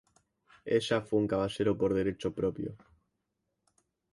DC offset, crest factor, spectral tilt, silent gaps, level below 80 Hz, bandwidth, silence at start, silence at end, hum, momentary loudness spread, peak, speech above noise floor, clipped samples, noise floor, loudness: under 0.1%; 18 dB; -6.5 dB/octave; none; -58 dBFS; 11.5 kHz; 0.65 s; 1.35 s; none; 10 LU; -16 dBFS; 52 dB; under 0.1%; -83 dBFS; -31 LUFS